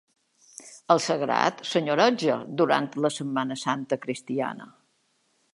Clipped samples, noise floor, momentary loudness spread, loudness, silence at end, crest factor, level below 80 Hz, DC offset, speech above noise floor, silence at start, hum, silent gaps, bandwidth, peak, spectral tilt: under 0.1%; -70 dBFS; 11 LU; -25 LUFS; 0.9 s; 22 dB; -78 dBFS; under 0.1%; 45 dB; 0.6 s; none; none; 11.5 kHz; -6 dBFS; -4.5 dB/octave